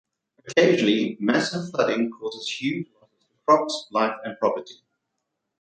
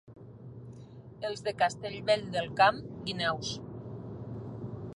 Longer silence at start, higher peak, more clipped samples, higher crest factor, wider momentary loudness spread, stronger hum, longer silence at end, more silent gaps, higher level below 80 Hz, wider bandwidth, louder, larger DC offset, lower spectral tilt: first, 0.45 s vs 0.05 s; first, -4 dBFS vs -10 dBFS; neither; about the same, 20 dB vs 22 dB; second, 11 LU vs 23 LU; neither; first, 0.9 s vs 0 s; neither; second, -72 dBFS vs -60 dBFS; second, 9.4 kHz vs 11.5 kHz; first, -23 LUFS vs -31 LUFS; neither; about the same, -5 dB/octave vs -4.5 dB/octave